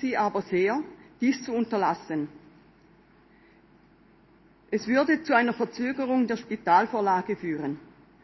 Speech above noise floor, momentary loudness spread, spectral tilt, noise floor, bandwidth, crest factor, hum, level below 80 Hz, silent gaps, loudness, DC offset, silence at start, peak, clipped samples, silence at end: 32 dB; 10 LU; -6 dB/octave; -58 dBFS; 6.2 kHz; 20 dB; none; -68 dBFS; none; -26 LUFS; under 0.1%; 0 s; -8 dBFS; under 0.1%; 0.4 s